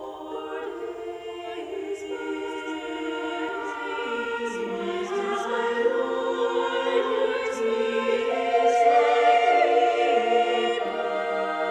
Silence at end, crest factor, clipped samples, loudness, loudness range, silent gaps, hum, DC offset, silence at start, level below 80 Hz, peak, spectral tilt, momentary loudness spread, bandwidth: 0 s; 16 dB; under 0.1%; -25 LUFS; 11 LU; none; none; under 0.1%; 0 s; -66 dBFS; -8 dBFS; -3.5 dB/octave; 14 LU; 9.8 kHz